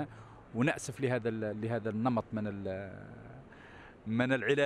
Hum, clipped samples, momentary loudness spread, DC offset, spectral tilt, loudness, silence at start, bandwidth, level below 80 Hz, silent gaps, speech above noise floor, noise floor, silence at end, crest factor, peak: none; under 0.1%; 21 LU; under 0.1%; -6 dB/octave; -34 LUFS; 0 s; 12.5 kHz; -64 dBFS; none; 20 dB; -53 dBFS; 0 s; 18 dB; -16 dBFS